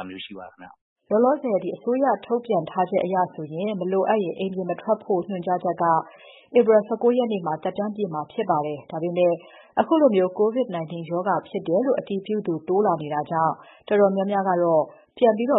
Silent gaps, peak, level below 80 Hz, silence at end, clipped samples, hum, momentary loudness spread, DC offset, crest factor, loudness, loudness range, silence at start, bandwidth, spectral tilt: 0.81-0.96 s; -4 dBFS; -72 dBFS; 0 s; under 0.1%; none; 9 LU; under 0.1%; 18 dB; -23 LUFS; 2 LU; 0 s; 4 kHz; -11.5 dB/octave